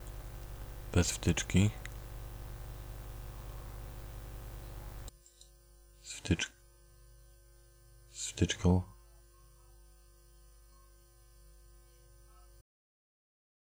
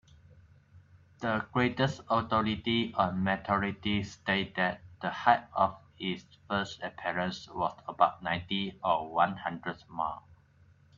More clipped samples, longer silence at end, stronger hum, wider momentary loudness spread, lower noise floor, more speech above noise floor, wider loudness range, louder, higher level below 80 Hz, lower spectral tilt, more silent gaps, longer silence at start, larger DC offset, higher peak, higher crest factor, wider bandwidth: neither; first, 1 s vs 0.65 s; first, 50 Hz at -50 dBFS vs none; first, 18 LU vs 9 LU; about the same, -61 dBFS vs -62 dBFS; about the same, 31 dB vs 31 dB; first, 13 LU vs 2 LU; second, -37 LUFS vs -31 LUFS; first, -48 dBFS vs -62 dBFS; about the same, -5 dB/octave vs -6 dB/octave; neither; second, 0 s vs 0.35 s; neither; second, -16 dBFS vs -10 dBFS; about the same, 22 dB vs 22 dB; first, over 20 kHz vs 7.6 kHz